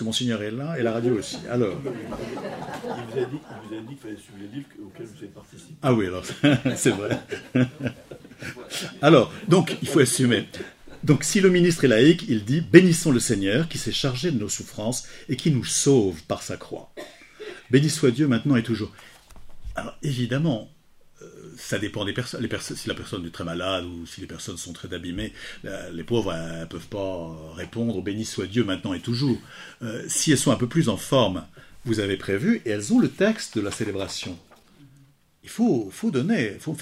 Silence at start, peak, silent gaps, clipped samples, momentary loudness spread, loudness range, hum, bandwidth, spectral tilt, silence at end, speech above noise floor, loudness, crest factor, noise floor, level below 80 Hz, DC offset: 0 s; 0 dBFS; none; under 0.1%; 19 LU; 12 LU; none; 16 kHz; -5 dB/octave; 0 s; 33 dB; -24 LUFS; 24 dB; -57 dBFS; -52 dBFS; under 0.1%